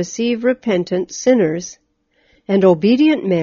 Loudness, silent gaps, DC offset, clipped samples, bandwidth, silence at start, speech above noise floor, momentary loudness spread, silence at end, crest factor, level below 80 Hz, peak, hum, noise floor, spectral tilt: -16 LUFS; none; under 0.1%; under 0.1%; 7.4 kHz; 0 s; 45 dB; 8 LU; 0 s; 16 dB; -58 dBFS; 0 dBFS; none; -60 dBFS; -6 dB/octave